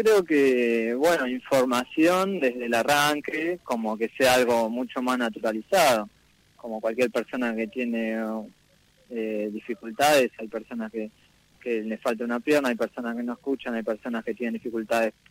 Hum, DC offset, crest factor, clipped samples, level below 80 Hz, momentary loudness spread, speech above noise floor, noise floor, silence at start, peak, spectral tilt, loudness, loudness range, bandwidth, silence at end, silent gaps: none; under 0.1%; 16 dB; under 0.1%; -64 dBFS; 13 LU; 36 dB; -61 dBFS; 0 s; -10 dBFS; -4 dB/octave; -25 LUFS; 6 LU; 16 kHz; 0.2 s; none